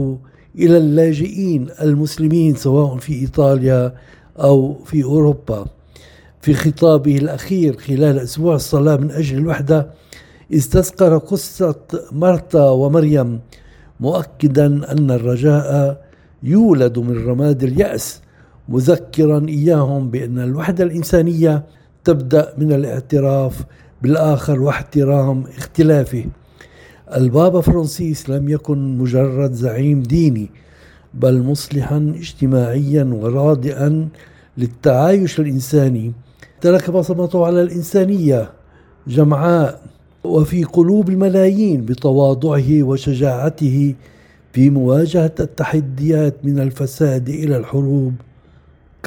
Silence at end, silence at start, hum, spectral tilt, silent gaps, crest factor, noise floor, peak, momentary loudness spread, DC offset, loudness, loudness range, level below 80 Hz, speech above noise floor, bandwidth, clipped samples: 0.85 s; 0 s; none; -8 dB/octave; none; 14 dB; -47 dBFS; 0 dBFS; 9 LU; under 0.1%; -15 LUFS; 2 LU; -40 dBFS; 33 dB; 17.5 kHz; under 0.1%